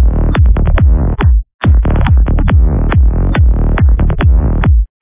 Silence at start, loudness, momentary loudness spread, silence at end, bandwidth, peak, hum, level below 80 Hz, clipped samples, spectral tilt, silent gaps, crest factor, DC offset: 0 s; -11 LUFS; 1 LU; 0.15 s; 3.8 kHz; 0 dBFS; none; -10 dBFS; 0.2%; -11.5 dB/octave; 1.54-1.59 s; 8 dB; under 0.1%